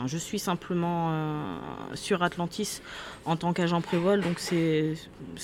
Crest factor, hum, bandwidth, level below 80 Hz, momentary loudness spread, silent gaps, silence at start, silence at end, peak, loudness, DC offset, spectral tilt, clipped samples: 16 dB; none; 16 kHz; -58 dBFS; 12 LU; none; 0 s; 0 s; -12 dBFS; -29 LUFS; under 0.1%; -5.5 dB/octave; under 0.1%